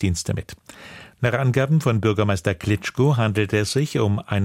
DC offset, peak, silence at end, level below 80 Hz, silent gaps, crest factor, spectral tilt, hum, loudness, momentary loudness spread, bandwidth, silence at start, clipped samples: under 0.1%; -6 dBFS; 0 s; -46 dBFS; none; 16 dB; -6 dB/octave; none; -21 LUFS; 20 LU; 16 kHz; 0 s; under 0.1%